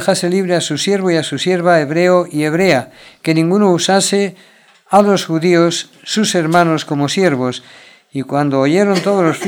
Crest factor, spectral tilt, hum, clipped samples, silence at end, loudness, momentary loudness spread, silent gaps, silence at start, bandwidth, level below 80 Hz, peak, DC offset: 14 dB; -5 dB/octave; none; under 0.1%; 0 s; -14 LUFS; 8 LU; none; 0 s; 18.5 kHz; -62 dBFS; 0 dBFS; under 0.1%